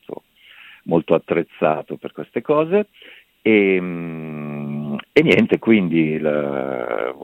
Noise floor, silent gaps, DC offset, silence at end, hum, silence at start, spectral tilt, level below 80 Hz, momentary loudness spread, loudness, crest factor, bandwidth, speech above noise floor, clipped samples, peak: -47 dBFS; none; under 0.1%; 0 s; none; 0.1 s; -8 dB/octave; -58 dBFS; 15 LU; -19 LUFS; 18 dB; 9.2 kHz; 29 dB; under 0.1%; 0 dBFS